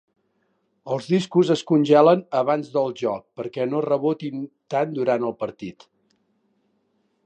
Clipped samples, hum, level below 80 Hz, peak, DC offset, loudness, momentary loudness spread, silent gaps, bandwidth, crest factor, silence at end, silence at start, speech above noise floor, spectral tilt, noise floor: under 0.1%; none; -72 dBFS; -2 dBFS; under 0.1%; -22 LUFS; 15 LU; none; 9.4 kHz; 20 dB; 1.55 s; 0.85 s; 48 dB; -7 dB/octave; -70 dBFS